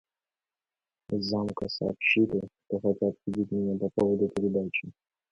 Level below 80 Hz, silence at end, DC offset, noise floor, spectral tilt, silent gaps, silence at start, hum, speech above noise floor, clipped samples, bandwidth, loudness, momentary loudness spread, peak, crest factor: -60 dBFS; 0.4 s; under 0.1%; under -90 dBFS; -7 dB/octave; none; 1.1 s; none; over 62 dB; under 0.1%; 8.8 kHz; -29 LUFS; 9 LU; -10 dBFS; 20 dB